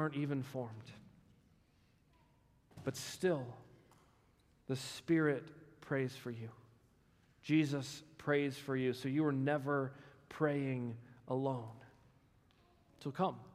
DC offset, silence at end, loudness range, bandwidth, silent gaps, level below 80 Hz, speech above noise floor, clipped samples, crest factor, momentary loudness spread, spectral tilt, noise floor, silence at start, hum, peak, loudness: under 0.1%; 0.05 s; 8 LU; 15.5 kHz; none; -76 dBFS; 33 dB; under 0.1%; 20 dB; 19 LU; -6.5 dB/octave; -71 dBFS; 0 s; none; -20 dBFS; -38 LUFS